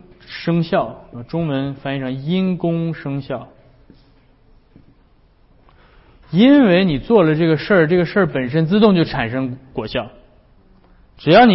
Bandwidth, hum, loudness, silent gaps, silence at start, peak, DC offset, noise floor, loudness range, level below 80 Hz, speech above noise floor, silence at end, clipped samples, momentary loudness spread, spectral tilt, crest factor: 5.8 kHz; none; -17 LUFS; none; 0.3 s; 0 dBFS; under 0.1%; -53 dBFS; 13 LU; -46 dBFS; 37 dB; 0 s; under 0.1%; 15 LU; -11.5 dB/octave; 16 dB